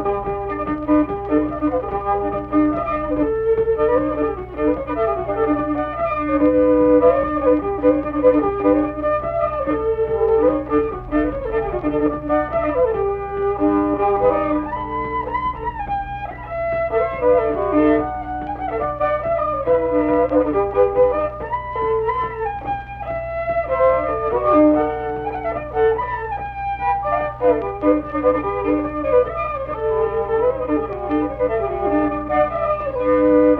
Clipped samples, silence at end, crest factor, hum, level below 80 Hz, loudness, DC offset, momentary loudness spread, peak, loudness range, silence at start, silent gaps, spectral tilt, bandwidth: under 0.1%; 0 s; 16 dB; none; -38 dBFS; -19 LUFS; under 0.1%; 8 LU; -2 dBFS; 3 LU; 0 s; none; -10 dB/octave; 4.3 kHz